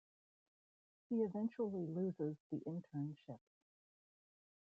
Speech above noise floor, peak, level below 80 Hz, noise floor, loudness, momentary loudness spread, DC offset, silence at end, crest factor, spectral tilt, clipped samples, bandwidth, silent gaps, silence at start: over 47 dB; -30 dBFS; -86 dBFS; under -90 dBFS; -43 LUFS; 11 LU; under 0.1%; 1.25 s; 16 dB; -10.5 dB/octave; under 0.1%; 5 kHz; 2.40-2.50 s; 1.1 s